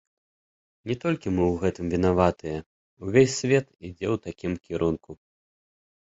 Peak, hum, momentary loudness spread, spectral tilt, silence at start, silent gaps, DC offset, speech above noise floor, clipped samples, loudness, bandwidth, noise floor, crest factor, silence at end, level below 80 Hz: -4 dBFS; none; 14 LU; -6 dB/octave; 0.85 s; 2.66-2.97 s; under 0.1%; over 65 dB; under 0.1%; -26 LUFS; 8 kHz; under -90 dBFS; 22 dB; 1 s; -46 dBFS